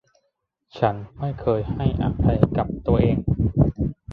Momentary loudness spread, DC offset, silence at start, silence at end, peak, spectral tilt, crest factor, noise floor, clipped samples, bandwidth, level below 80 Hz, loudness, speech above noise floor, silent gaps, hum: 6 LU; under 0.1%; 0.75 s; 0 s; 0 dBFS; -11 dB/octave; 22 dB; -74 dBFS; under 0.1%; 5.2 kHz; -32 dBFS; -22 LUFS; 53 dB; none; none